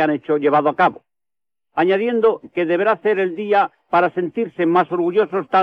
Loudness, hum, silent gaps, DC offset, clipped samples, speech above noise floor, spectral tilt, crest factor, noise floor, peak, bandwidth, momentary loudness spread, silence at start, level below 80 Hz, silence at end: -18 LUFS; none; none; under 0.1%; under 0.1%; over 73 dB; -8 dB/octave; 12 dB; under -90 dBFS; -6 dBFS; 5.8 kHz; 4 LU; 0 s; -68 dBFS; 0 s